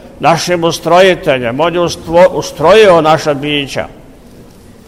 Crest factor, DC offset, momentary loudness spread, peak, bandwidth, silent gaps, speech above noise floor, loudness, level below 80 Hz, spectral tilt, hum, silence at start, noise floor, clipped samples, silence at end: 10 dB; 0.4%; 9 LU; 0 dBFS; 15.5 kHz; none; 27 dB; -10 LUFS; -40 dBFS; -4.5 dB/octave; none; 0.05 s; -36 dBFS; 0.3%; 0.45 s